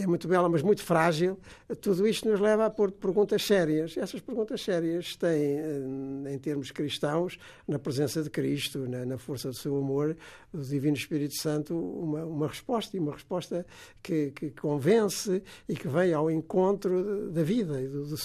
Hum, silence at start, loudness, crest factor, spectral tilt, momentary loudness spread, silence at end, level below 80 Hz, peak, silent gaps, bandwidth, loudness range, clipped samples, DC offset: none; 0 s; -29 LUFS; 18 dB; -6 dB/octave; 11 LU; 0 s; -64 dBFS; -12 dBFS; none; 15 kHz; 5 LU; under 0.1%; under 0.1%